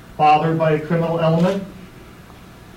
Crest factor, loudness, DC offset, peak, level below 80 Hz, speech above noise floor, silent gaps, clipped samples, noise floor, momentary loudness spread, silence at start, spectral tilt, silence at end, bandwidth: 14 dB; -18 LUFS; under 0.1%; -6 dBFS; -48 dBFS; 25 dB; none; under 0.1%; -41 dBFS; 8 LU; 0.1 s; -7.5 dB/octave; 0.3 s; 11.5 kHz